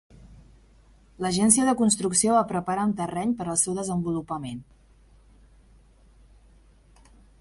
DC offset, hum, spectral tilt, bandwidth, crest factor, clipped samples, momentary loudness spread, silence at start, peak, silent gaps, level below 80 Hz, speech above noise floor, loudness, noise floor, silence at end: under 0.1%; none; -4 dB/octave; 11.5 kHz; 24 dB; under 0.1%; 13 LU; 0.2 s; -2 dBFS; none; -54 dBFS; 31 dB; -24 LUFS; -56 dBFS; 2.8 s